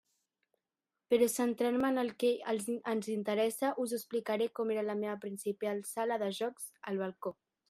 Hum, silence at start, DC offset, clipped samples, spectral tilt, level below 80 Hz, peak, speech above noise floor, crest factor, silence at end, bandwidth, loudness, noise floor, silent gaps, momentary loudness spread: none; 1.1 s; under 0.1%; under 0.1%; -4.5 dB/octave; -80 dBFS; -18 dBFS; over 56 dB; 18 dB; 0.35 s; 15 kHz; -34 LUFS; under -90 dBFS; none; 8 LU